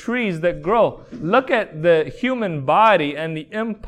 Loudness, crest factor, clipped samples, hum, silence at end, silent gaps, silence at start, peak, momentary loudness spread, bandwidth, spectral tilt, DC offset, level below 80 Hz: -19 LUFS; 16 dB; under 0.1%; none; 0 s; none; 0 s; -2 dBFS; 11 LU; 9.6 kHz; -7 dB/octave; under 0.1%; -48 dBFS